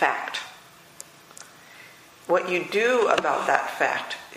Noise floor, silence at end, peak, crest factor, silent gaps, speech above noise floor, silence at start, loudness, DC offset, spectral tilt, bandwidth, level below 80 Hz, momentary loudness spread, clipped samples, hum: -49 dBFS; 0 s; -2 dBFS; 24 dB; none; 26 dB; 0 s; -24 LUFS; under 0.1%; -3 dB/octave; 15.5 kHz; -72 dBFS; 24 LU; under 0.1%; none